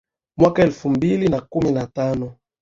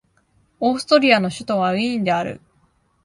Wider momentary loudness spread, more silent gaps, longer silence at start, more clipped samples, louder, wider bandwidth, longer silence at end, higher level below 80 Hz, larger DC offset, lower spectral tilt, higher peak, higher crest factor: about the same, 11 LU vs 9 LU; neither; second, 0.4 s vs 0.6 s; neither; about the same, -19 LUFS vs -19 LUFS; second, 7.6 kHz vs 11.5 kHz; second, 0.3 s vs 0.65 s; first, -46 dBFS vs -60 dBFS; neither; first, -8 dB/octave vs -5 dB/octave; about the same, -2 dBFS vs 0 dBFS; about the same, 18 dB vs 20 dB